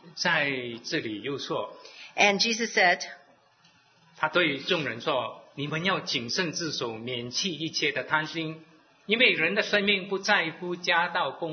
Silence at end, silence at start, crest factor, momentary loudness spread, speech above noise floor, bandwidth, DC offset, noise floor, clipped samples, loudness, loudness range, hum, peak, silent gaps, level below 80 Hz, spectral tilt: 0 s; 0.05 s; 22 dB; 12 LU; 34 dB; 6.6 kHz; under 0.1%; -61 dBFS; under 0.1%; -26 LUFS; 4 LU; none; -6 dBFS; none; -74 dBFS; -3 dB/octave